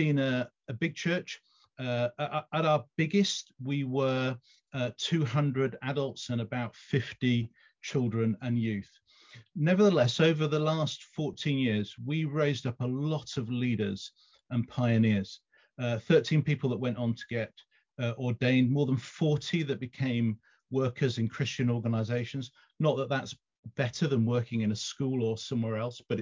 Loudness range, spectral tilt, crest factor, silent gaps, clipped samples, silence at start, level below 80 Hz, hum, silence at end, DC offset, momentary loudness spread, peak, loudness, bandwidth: 3 LU; -6.5 dB/octave; 18 dB; 23.59-23.63 s; under 0.1%; 0 s; -64 dBFS; none; 0 s; under 0.1%; 10 LU; -12 dBFS; -30 LUFS; 7.6 kHz